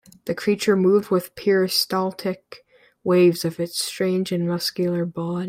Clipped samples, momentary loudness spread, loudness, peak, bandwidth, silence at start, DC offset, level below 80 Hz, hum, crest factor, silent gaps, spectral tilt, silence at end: under 0.1%; 10 LU; -22 LUFS; -6 dBFS; 16.5 kHz; 0.25 s; under 0.1%; -64 dBFS; none; 16 dB; none; -5 dB/octave; 0 s